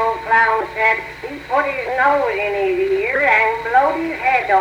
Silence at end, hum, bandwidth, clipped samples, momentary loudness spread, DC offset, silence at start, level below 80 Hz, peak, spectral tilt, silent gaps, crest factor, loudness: 0 s; none; 17.5 kHz; under 0.1%; 6 LU; under 0.1%; 0 s; -48 dBFS; -4 dBFS; -5 dB/octave; none; 14 dB; -16 LUFS